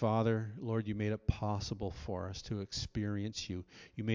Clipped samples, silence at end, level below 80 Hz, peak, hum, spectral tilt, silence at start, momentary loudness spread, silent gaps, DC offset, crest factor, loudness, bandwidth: under 0.1%; 0 s; -50 dBFS; -16 dBFS; none; -6 dB/octave; 0 s; 7 LU; none; under 0.1%; 20 dB; -38 LUFS; 7.6 kHz